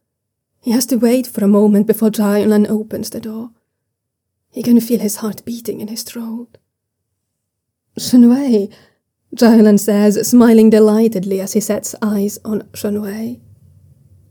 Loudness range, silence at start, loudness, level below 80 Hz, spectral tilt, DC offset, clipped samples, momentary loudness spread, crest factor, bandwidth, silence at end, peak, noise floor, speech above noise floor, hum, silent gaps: 9 LU; 0.65 s; -14 LUFS; -58 dBFS; -6 dB/octave; under 0.1%; under 0.1%; 17 LU; 14 dB; over 20 kHz; 0.95 s; 0 dBFS; -75 dBFS; 62 dB; none; none